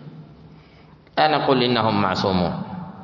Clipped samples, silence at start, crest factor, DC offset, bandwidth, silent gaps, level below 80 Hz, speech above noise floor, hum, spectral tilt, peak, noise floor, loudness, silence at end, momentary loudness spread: under 0.1%; 0 s; 18 dB; under 0.1%; 7.4 kHz; none; -56 dBFS; 29 dB; none; -6.5 dB/octave; -6 dBFS; -48 dBFS; -20 LUFS; 0 s; 13 LU